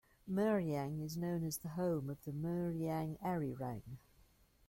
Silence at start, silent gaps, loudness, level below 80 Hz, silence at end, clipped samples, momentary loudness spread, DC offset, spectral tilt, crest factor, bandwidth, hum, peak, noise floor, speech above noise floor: 0.25 s; none; -40 LUFS; -66 dBFS; 0.7 s; under 0.1%; 10 LU; under 0.1%; -7 dB/octave; 16 dB; 16.5 kHz; none; -24 dBFS; -69 dBFS; 30 dB